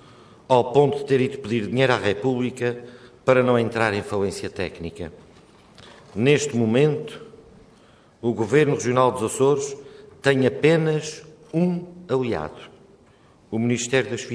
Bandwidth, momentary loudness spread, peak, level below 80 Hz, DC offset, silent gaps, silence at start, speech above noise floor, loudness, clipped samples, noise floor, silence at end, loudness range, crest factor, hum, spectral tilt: 11 kHz; 14 LU; -4 dBFS; -58 dBFS; under 0.1%; none; 0.5 s; 33 dB; -22 LUFS; under 0.1%; -54 dBFS; 0 s; 4 LU; 20 dB; none; -5.5 dB/octave